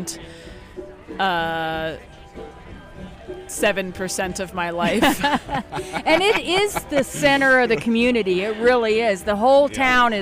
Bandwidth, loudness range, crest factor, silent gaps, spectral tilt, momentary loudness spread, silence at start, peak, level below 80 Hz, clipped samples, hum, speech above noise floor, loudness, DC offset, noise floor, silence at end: 15.5 kHz; 9 LU; 16 dB; none; -3.5 dB/octave; 22 LU; 0 s; -6 dBFS; -44 dBFS; under 0.1%; none; 20 dB; -19 LUFS; under 0.1%; -40 dBFS; 0 s